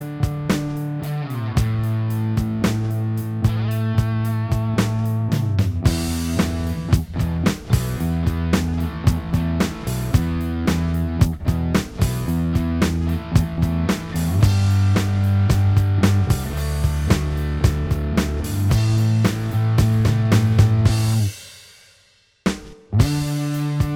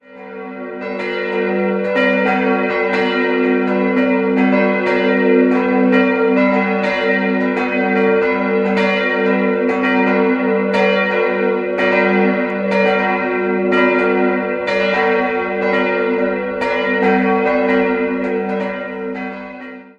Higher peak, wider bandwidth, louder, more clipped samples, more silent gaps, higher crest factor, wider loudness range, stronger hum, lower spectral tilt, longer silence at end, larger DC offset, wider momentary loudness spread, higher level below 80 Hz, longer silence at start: about the same, -2 dBFS vs 0 dBFS; first, 16.5 kHz vs 7.4 kHz; second, -21 LUFS vs -15 LUFS; neither; neither; about the same, 18 dB vs 14 dB; about the same, 3 LU vs 2 LU; neither; about the same, -6.5 dB/octave vs -7.5 dB/octave; about the same, 0 s vs 0.1 s; neither; about the same, 6 LU vs 8 LU; first, -30 dBFS vs -52 dBFS; about the same, 0 s vs 0.1 s